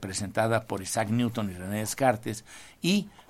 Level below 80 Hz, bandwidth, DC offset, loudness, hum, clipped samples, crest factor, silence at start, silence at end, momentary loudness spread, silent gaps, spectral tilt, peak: -60 dBFS; 16.5 kHz; under 0.1%; -29 LUFS; none; under 0.1%; 20 dB; 0 s; 0.1 s; 8 LU; none; -4.5 dB/octave; -8 dBFS